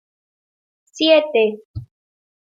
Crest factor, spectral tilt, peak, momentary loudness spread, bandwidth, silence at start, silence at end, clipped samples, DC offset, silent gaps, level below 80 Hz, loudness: 18 dB; -4.5 dB/octave; -2 dBFS; 22 LU; 7.6 kHz; 0.95 s; 0.65 s; under 0.1%; under 0.1%; 1.65-1.74 s; -54 dBFS; -16 LUFS